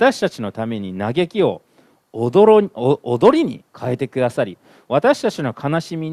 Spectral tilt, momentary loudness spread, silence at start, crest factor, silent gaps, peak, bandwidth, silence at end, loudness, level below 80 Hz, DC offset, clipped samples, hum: -6.5 dB/octave; 12 LU; 0 s; 18 dB; none; 0 dBFS; 12.5 kHz; 0 s; -18 LUFS; -60 dBFS; under 0.1%; under 0.1%; none